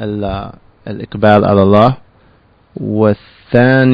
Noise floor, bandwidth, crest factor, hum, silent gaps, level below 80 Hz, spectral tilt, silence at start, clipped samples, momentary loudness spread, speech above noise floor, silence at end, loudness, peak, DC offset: -49 dBFS; 5.2 kHz; 12 dB; none; none; -40 dBFS; -9.5 dB/octave; 0 s; 0.3%; 18 LU; 38 dB; 0 s; -12 LUFS; 0 dBFS; under 0.1%